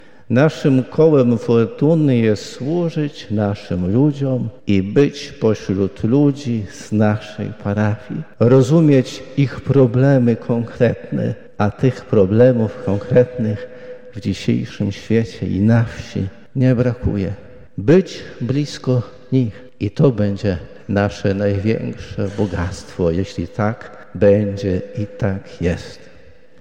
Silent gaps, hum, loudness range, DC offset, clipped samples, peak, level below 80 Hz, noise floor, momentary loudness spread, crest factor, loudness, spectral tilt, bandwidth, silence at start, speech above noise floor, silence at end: none; none; 4 LU; 0.9%; under 0.1%; -2 dBFS; -44 dBFS; -47 dBFS; 12 LU; 14 dB; -18 LUFS; -8 dB/octave; 9.4 kHz; 0.3 s; 30 dB; 0.65 s